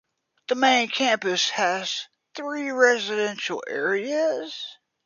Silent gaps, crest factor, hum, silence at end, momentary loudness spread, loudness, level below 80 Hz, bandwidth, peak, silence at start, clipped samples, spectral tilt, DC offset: none; 20 dB; none; 0.3 s; 15 LU; -23 LUFS; -80 dBFS; 7.4 kHz; -4 dBFS; 0.5 s; under 0.1%; -2 dB/octave; under 0.1%